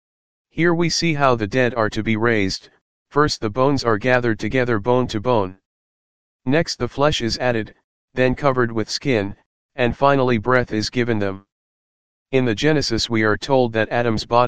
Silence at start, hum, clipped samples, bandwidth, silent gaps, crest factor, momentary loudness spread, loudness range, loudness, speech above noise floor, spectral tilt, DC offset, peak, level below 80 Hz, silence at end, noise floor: 0.45 s; none; under 0.1%; 9.8 kHz; 2.81-3.05 s, 5.66-6.39 s, 7.84-8.08 s, 9.46-9.69 s, 11.52-12.25 s; 20 dB; 7 LU; 2 LU; -19 LUFS; over 71 dB; -5.5 dB/octave; 2%; 0 dBFS; -44 dBFS; 0 s; under -90 dBFS